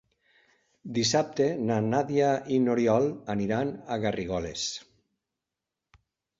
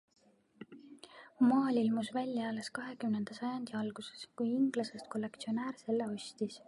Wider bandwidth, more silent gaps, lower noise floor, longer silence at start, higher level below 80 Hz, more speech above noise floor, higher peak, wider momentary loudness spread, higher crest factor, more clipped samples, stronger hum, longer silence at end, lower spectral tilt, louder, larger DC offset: second, 7.8 kHz vs 11.5 kHz; neither; first, -88 dBFS vs -57 dBFS; first, 0.85 s vs 0.6 s; first, -58 dBFS vs -82 dBFS; first, 61 dB vs 22 dB; first, -10 dBFS vs -20 dBFS; second, 8 LU vs 23 LU; about the same, 18 dB vs 16 dB; neither; neither; first, 1.55 s vs 0.1 s; about the same, -5 dB/octave vs -5.5 dB/octave; first, -27 LUFS vs -36 LUFS; neither